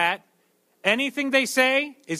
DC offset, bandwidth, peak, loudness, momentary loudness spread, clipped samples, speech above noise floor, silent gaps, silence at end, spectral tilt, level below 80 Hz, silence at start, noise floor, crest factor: under 0.1%; 15.5 kHz; -6 dBFS; -22 LUFS; 6 LU; under 0.1%; 43 dB; none; 0 s; -2.5 dB/octave; -76 dBFS; 0 s; -66 dBFS; 18 dB